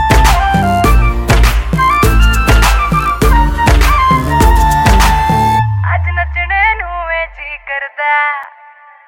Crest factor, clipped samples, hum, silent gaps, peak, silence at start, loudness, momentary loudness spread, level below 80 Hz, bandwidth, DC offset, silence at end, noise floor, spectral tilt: 10 dB; under 0.1%; none; none; 0 dBFS; 0 s; -11 LUFS; 8 LU; -14 dBFS; 17 kHz; under 0.1%; 0.6 s; -39 dBFS; -5 dB/octave